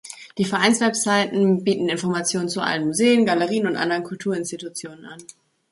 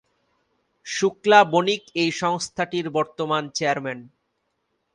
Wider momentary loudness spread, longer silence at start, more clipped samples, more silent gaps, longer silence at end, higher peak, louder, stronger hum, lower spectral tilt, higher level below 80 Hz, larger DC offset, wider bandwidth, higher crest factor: first, 16 LU vs 13 LU; second, 0.05 s vs 0.85 s; neither; neither; second, 0.5 s vs 0.9 s; about the same, -4 dBFS vs -2 dBFS; about the same, -21 LUFS vs -22 LUFS; neither; about the same, -4 dB/octave vs -4 dB/octave; about the same, -66 dBFS vs -68 dBFS; neither; about the same, 11.5 kHz vs 11 kHz; about the same, 18 dB vs 22 dB